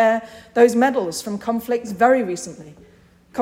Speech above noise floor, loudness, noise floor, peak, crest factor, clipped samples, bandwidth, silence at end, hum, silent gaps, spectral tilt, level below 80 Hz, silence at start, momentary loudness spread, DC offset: 26 dB; -19 LUFS; -46 dBFS; -2 dBFS; 18 dB; under 0.1%; 16.5 kHz; 0 s; none; none; -4.5 dB/octave; -60 dBFS; 0 s; 13 LU; under 0.1%